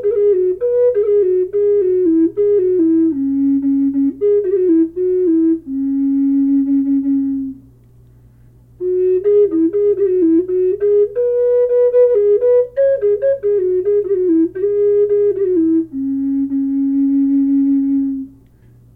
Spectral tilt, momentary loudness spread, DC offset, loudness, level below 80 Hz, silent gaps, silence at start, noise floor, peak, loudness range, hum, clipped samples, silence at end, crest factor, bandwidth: -11 dB/octave; 5 LU; under 0.1%; -15 LUFS; -50 dBFS; none; 0 s; -46 dBFS; -4 dBFS; 4 LU; none; under 0.1%; 0.65 s; 10 dB; 2.7 kHz